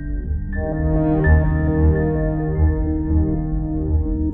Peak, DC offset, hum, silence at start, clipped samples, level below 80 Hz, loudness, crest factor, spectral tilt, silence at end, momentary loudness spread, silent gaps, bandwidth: -4 dBFS; under 0.1%; none; 0 s; under 0.1%; -22 dBFS; -20 LUFS; 14 dB; -11 dB/octave; 0 s; 8 LU; none; 2.5 kHz